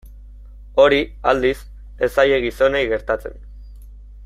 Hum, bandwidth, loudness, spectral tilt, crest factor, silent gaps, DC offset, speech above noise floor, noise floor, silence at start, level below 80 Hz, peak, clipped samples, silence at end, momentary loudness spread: 50 Hz at -35 dBFS; 14.5 kHz; -18 LUFS; -5 dB/octave; 18 dB; none; under 0.1%; 21 dB; -39 dBFS; 0.05 s; -38 dBFS; -2 dBFS; under 0.1%; 0 s; 10 LU